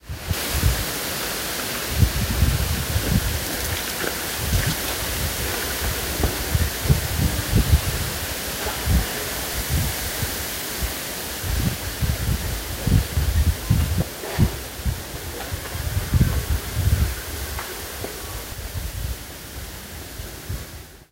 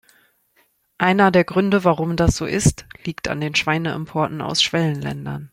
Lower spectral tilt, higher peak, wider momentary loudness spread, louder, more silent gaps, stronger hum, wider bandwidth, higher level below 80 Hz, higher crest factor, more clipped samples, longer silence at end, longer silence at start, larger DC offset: about the same, -4 dB/octave vs -5 dB/octave; about the same, -2 dBFS vs -2 dBFS; about the same, 10 LU vs 12 LU; second, -24 LUFS vs -19 LUFS; neither; neither; about the same, 16 kHz vs 16 kHz; first, -28 dBFS vs -40 dBFS; about the same, 20 dB vs 18 dB; neither; about the same, 0.1 s vs 0.05 s; second, 0.05 s vs 1 s; neither